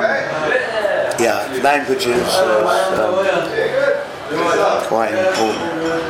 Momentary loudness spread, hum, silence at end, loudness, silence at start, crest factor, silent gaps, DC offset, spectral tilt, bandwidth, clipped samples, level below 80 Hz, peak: 4 LU; none; 0 s; -17 LUFS; 0 s; 14 dB; none; under 0.1%; -3.5 dB/octave; 16.5 kHz; under 0.1%; -52 dBFS; -4 dBFS